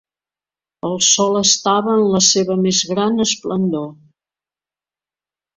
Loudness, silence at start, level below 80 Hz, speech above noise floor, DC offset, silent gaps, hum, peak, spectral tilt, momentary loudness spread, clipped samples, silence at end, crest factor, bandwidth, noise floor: -15 LUFS; 0.85 s; -58 dBFS; over 74 dB; under 0.1%; none; none; 0 dBFS; -3 dB/octave; 11 LU; under 0.1%; 1.65 s; 18 dB; 8.2 kHz; under -90 dBFS